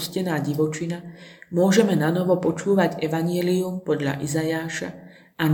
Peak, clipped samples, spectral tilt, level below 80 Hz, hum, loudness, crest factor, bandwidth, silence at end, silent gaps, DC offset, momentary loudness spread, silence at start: -4 dBFS; under 0.1%; -6 dB/octave; -62 dBFS; none; -23 LUFS; 18 dB; 19 kHz; 0 s; none; under 0.1%; 11 LU; 0 s